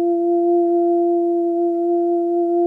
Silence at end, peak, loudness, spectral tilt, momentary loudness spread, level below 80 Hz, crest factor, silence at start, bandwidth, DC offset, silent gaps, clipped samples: 0 s; -10 dBFS; -18 LUFS; -9.5 dB/octave; 2 LU; -76 dBFS; 8 dB; 0 s; 1.4 kHz; under 0.1%; none; under 0.1%